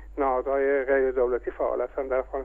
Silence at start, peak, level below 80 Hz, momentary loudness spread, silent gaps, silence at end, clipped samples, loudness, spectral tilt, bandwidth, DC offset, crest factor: 0 s; -12 dBFS; -46 dBFS; 5 LU; none; 0 s; under 0.1%; -26 LUFS; -8.5 dB/octave; 3.5 kHz; under 0.1%; 14 dB